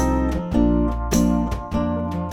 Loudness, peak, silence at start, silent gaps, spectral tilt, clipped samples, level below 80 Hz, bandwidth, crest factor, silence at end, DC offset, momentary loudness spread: -21 LUFS; -6 dBFS; 0 s; none; -6.5 dB/octave; under 0.1%; -26 dBFS; 16.5 kHz; 14 dB; 0 s; under 0.1%; 5 LU